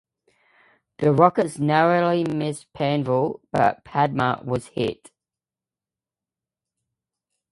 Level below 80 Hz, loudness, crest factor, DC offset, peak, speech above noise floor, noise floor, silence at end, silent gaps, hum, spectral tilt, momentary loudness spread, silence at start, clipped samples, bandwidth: -60 dBFS; -22 LUFS; 24 dB; under 0.1%; 0 dBFS; over 69 dB; under -90 dBFS; 2.6 s; none; none; -7 dB/octave; 10 LU; 1 s; under 0.1%; 11.5 kHz